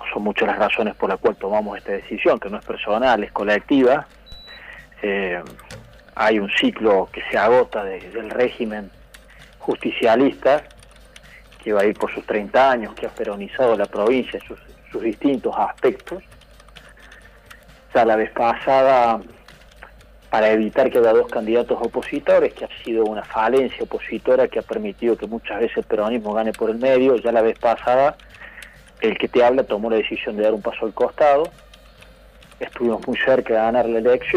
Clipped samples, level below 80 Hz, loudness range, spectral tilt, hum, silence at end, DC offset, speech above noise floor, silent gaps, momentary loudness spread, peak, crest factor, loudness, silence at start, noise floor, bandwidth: under 0.1%; -50 dBFS; 3 LU; -6 dB/octave; none; 0 s; under 0.1%; 27 dB; none; 14 LU; -6 dBFS; 14 dB; -19 LUFS; 0 s; -46 dBFS; 14 kHz